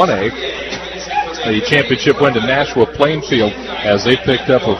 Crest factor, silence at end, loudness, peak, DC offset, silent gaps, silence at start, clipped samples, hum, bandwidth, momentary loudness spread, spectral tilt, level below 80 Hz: 14 dB; 0 s; -15 LUFS; 0 dBFS; under 0.1%; none; 0 s; under 0.1%; none; 8.6 kHz; 8 LU; -5 dB/octave; -40 dBFS